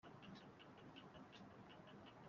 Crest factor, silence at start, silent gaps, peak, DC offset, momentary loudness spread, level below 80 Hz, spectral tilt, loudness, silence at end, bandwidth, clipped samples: 16 dB; 0.05 s; none; -44 dBFS; under 0.1%; 2 LU; -84 dBFS; -4 dB/octave; -61 LUFS; 0 s; 7.2 kHz; under 0.1%